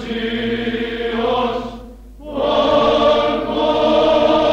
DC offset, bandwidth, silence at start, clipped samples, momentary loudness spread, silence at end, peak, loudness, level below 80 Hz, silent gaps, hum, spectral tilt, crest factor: under 0.1%; 8.4 kHz; 0 s; under 0.1%; 13 LU; 0 s; -4 dBFS; -17 LUFS; -38 dBFS; none; none; -5.5 dB/octave; 12 dB